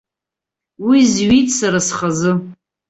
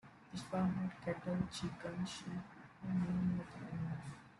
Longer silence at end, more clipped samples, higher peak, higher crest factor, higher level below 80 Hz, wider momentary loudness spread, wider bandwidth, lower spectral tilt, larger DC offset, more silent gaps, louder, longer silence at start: first, 0.35 s vs 0.05 s; neither; first, -2 dBFS vs -24 dBFS; about the same, 14 dB vs 16 dB; first, -46 dBFS vs -66 dBFS; second, 7 LU vs 11 LU; second, 8.2 kHz vs 11.5 kHz; second, -4.5 dB/octave vs -6.5 dB/octave; neither; neither; first, -15 LUFS vs -42 LUFS; first, 0.8 s vs 0.05 s